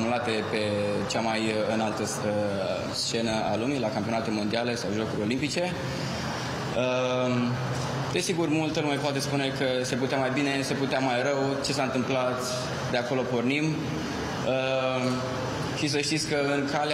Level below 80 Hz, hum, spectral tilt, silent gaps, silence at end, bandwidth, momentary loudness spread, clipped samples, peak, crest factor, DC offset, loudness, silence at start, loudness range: -56 dBFS; none; -4.5 dB/octave; none; 0 s; 15.5 kHz; 4 LU; under 0.1%; -12 dBFS; 16 dB; under 0.1%; -27 LUFS; 0 s; 2 LU